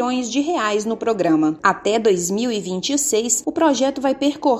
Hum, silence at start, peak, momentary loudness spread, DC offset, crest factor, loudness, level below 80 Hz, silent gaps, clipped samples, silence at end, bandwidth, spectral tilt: none; 0 s; -2 dBFS; 4 LU; under 0.1%; 16 dB; -19 LUFS; -58 dBFS; none; under 0.1%; 0 s; 16 kHz; -3.5 dB/octave